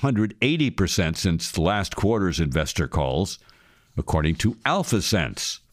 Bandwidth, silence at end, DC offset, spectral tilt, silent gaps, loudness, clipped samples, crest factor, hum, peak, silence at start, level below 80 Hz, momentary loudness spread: 15.5 kHz; 0.15 s; under 0.1%; -5 dB/octave; none; -23 LUFS; under 0.1%; 18 dB; none; -4 dBFS; 0 s; -38 dBFS; 5 LU